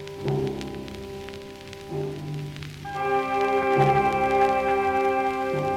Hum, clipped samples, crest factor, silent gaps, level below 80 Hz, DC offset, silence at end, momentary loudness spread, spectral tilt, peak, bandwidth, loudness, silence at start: none; under 0.1%; 16 dB; none; -50 dBFS; under 0.1%; 0 s; 16 LU; -6.5 dB/octave; -8 dBFS; 15.5 kHz; -24 LUFS; 0 s